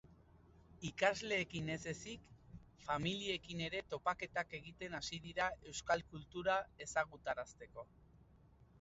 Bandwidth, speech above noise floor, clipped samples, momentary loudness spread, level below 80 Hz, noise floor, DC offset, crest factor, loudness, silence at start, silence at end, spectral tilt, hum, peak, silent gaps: 7.6 kHz; 25 dB; under 0.1%; 16 LU; -66 dBFS; -66 dBFS; under 0.1%; 24 dB; -41 LUFS; 0.05 s; 0.05 s; -2.5 dB/octave; none; -18 dBFS; none